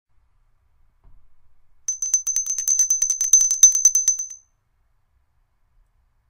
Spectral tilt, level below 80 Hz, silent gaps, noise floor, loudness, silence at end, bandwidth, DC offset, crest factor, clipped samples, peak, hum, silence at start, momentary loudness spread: 4.5 dB/octave; -58 dBFS; none; -65 dBFS; -16 LUFS; 1.95 s; 16.5 kHz; under 0.1%; 22 dB; under 0.1%; 0 dBFS; none; 1.9 s; 15 LU